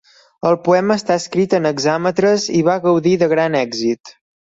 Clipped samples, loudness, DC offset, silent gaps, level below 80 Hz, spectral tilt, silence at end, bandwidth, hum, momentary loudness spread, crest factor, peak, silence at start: under 0.1%; -16 LUFS; under 0.1%; 4.00-4.04 s; -58 dBFS; -5.5 dB/octave; 0.45 s; 8 kHz; none; 5 LU; 14 dB; -2 dBFS; 0.45 s